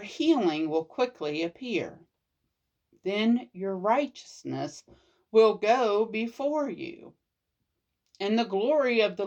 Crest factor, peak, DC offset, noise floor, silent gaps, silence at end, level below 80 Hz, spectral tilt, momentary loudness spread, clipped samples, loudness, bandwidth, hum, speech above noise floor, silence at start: 18 dB; -10 dBFS; under 0.1%; -82 dBFS; none; 0 s; -76 dBFS; -5.5 dB/octave; 14 LU; under 0.1%; -27 LUFS; 8.4 kHz; none; 54 dB; 0 s